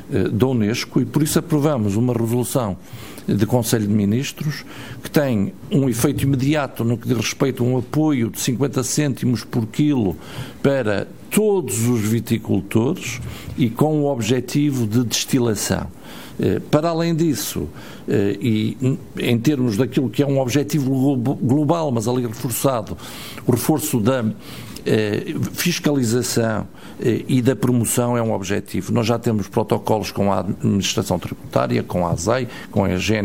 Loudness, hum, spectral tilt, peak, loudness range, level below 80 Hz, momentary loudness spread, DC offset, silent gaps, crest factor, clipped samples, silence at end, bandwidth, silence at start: -20 LUFS; none; -5.5 dB/octave; -2 dBFS; 2 LU; -48 dBFS; 7 LU; 0.8%; none; 18 dB; under 0.1%; 0 s; 16.5 kHz; 0 s